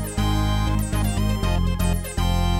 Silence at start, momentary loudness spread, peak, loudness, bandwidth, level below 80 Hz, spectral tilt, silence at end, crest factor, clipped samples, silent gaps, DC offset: 0 s; 2 LU; -10 dBFS; -23 LUFS; 16.5 kHz; -24 dBFS; -5.5 dB/octave; 0 s; 10 dB; under 0.1%; none; under 0.1%